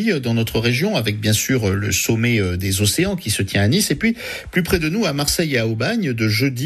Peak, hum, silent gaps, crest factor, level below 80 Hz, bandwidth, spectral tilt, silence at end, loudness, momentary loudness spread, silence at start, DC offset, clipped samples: -4 dBFS; none; none; 14 dB; -40 dBFS; 14.5 kHz; -4.5 dB/octave; 0 s; -18 LUFS; 3 LU; 0 s; under 0.1%; under 0.1%